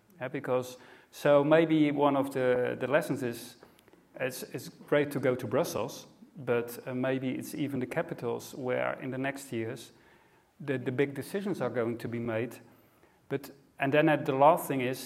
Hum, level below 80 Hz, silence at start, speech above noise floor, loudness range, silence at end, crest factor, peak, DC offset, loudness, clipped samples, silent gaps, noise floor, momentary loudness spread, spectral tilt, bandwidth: none; -74 dBFS; 0.2 s; 33 dB; 7 LU; 0 s; 22 dB; -8 dBFS; under 0.1%; -30 LUFS; under 0.1%; none; -63 dBFS; 16 LU; -6 dB/octave; 16 kHz